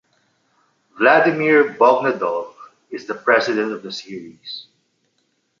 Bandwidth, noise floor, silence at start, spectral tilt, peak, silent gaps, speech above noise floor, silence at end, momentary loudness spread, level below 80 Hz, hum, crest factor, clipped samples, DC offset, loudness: 7.4 kHz; -68 dBFS; 0.95 s; -5 dB/octave; -2 dBFS; none; 50 dB; 1 s; 20 LU; -72 dBFS; none; 18 dB; under 0.1%; under 0.1%; -17 LUFS